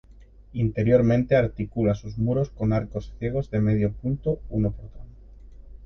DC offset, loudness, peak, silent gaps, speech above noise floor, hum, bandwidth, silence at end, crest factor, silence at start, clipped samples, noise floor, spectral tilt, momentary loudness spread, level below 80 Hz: under 0.1%; -25 LUFS; -6 dBFS; none; 25 dB; none; 6.4 kHz; 0 s; 18 dB; 0.2 s; under 0.1%; -49 dBFS; -9.5 dB/octave; 10 LU; -42 dBFS